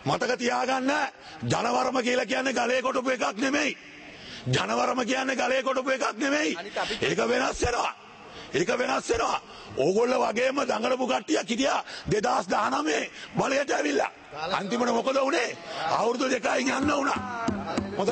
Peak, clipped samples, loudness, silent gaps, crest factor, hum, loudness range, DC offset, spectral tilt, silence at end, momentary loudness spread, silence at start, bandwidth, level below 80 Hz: -10 dBFS; under 0.1%; -26 LUFS; none; 16 dB; none; 1 LU; under 0.1%; -4 dB/octave; 0 s; 7 LU; 0 s; 8.8 kHz; -54 dBFS